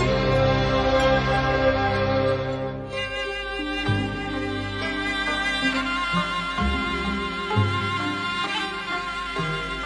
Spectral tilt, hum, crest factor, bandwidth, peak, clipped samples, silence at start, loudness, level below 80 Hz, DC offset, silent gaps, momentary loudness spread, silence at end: -5.5 dB/octave; none; 16 dB; 11 kHz; -8 dBFS; under 0.1%; 0 s; -24 LUFS; -36 dBFS; under 0.1%; none; 7 LU; 0 s